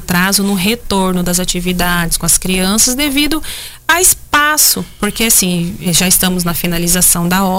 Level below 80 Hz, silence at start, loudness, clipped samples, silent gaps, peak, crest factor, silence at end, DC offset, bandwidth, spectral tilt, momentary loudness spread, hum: -28 dBFS; 0 s; -11 LUFS; under 0.1%; none; 0 dBFS; 12 dB; 0 s; under 0.1%; 16.5 kHz; -2.5 dB/octave; 7 LU; none